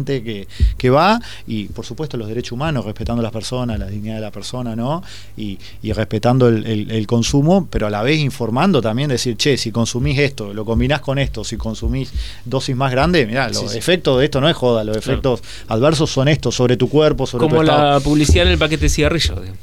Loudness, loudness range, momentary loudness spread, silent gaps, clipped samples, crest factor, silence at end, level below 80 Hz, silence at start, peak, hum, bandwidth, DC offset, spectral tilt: -17 LUFS; 9 LU; 12 LU; none; under 0.1%; 14 dB; 0.05 s; -28 dBFS; 0 s; -2 dBFS; none; 18 kHz; 2%; -5.5 dB/octave